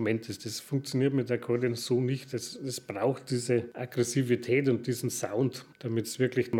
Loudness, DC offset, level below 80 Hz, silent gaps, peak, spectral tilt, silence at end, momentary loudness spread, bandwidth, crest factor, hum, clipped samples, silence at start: -30 LUFS; under 0.1%; -76 dBFS; none; -14 dBFS; -5.5 dB/octave; 0 s; 9 LU; 17.5 kHz; 16 dB; none; under 0.1%; 0 s